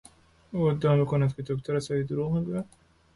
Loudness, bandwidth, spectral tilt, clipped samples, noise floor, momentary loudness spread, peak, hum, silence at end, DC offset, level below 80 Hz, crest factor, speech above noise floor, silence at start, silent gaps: -28 LUFS; 11.5 kHz; -8 dB/octave; under 0.1%; -51 dBFS; 11 LU; -14 dBFS; none; 0.5 s; under 0.1%; -56 dBFS; 14 dB; 25 dB; 0.5 s; none